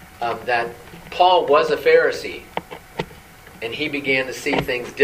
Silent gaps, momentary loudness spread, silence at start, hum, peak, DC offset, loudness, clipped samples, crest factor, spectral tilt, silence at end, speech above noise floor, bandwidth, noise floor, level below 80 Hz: none; 16 LU; 0 s; none; -2 dBFS; under 0.1%; -19 LUFS; under 0.1%; 18 dB; -4 dB/octave; 0 s; 24 dB; 15.5 kHz; -43 dBFS; -50 dBFS